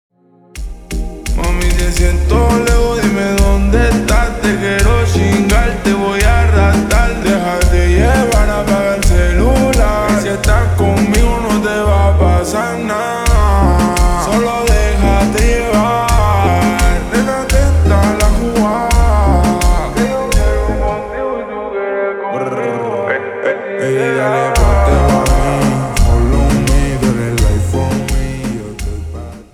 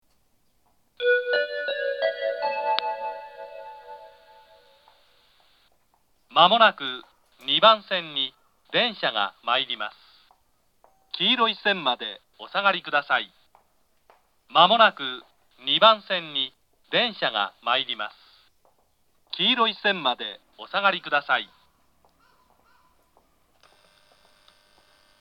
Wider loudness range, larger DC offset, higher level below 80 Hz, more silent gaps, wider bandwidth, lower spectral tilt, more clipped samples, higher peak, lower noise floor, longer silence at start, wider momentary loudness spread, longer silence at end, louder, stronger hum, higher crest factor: second, 3 LU vs 8 LU; neither; first, -16 dBFS vs -76 dBFS; neither; first, 14 kHz vs 6.8 kHz; about the same, -5.5 dB/octave vs -4.5 dB/octave; neither; about the same, 0 dBFS vs 0 dBFS; second, -34 dBFS vs -68 dBFS; second, 0.55 s vs 1 s; second, 7 LU vs 19 LU; second, 0.1 s vs 3.75 s; first, -13 LUFS vs -23 LUFS; neither; second, 12 dB vs 26 dB